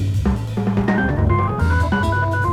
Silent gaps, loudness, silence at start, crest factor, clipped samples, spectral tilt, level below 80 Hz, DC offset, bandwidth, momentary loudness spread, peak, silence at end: none; -19 LUFS; 0 s; 12 dB; under 0.1%; -7.5 dB/octave; -26 dBFS; under 0.1%; 11.5 kHz; 3 LU; -6 dBFS; 0 s